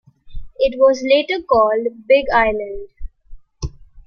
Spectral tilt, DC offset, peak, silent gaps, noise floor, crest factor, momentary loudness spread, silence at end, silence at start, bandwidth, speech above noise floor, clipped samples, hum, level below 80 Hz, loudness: -5 dB/octave; under 0.1%; -2 dBFS; none; -38 dBFS; 16 dB; 18 LU; 0.05 s; 0.25 s; 6.8 kHz; 22 dB; under 0.1%; none; -36 dBFS; -16 LUFS